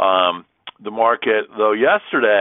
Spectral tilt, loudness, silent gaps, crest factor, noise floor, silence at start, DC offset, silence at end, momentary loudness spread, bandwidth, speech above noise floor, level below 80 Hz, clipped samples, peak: -8 dB/octave; -17 LUFS; none; 16 dB; -39 dBFS; 0 s; under 0.1%; 0 s; 14 LU; 3.9 kHz; 22 dB; -68 dBFS; under 0.1%; -2 dBFS